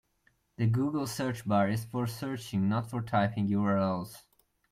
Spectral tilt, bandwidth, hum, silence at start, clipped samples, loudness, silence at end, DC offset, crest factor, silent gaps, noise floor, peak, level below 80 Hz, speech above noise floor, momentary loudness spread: -7 dB/octave; 15.5 kHz; none; 0.6 s; under 0.1%; -31 LUFS; 0.5 s; under 0.1%; 16 dB; none; -71 dBFS; -14 dBFS; -64 dBFS; 41 dB; 7 LU